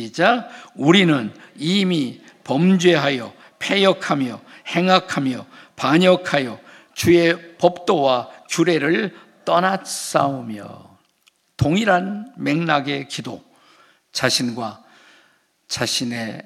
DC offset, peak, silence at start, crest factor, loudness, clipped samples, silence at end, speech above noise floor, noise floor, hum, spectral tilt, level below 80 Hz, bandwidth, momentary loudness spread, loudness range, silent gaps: under 0.1%; 0 dBFS; 0 s; 20 dB; -19 LUFS; under 0.1%; 0.05 s; 42 dB; -61 dBFS; none; -5 dB/octave; -58 dBFS; 15 kHz; 15 LU; 5 LU; none